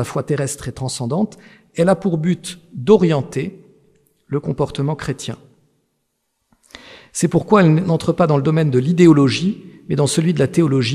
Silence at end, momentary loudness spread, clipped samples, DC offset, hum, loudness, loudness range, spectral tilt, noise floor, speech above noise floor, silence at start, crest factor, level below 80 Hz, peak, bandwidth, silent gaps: 0 s; 13 LU; under 0.1%; under 0.1%; none; -17 LUFS; 11 LU; -6.5 dB/octave; -71 dBFS; 54 dB; 0 s; 18 dB; -50 dBFS; 0 dBFS; 14.5 kHz; none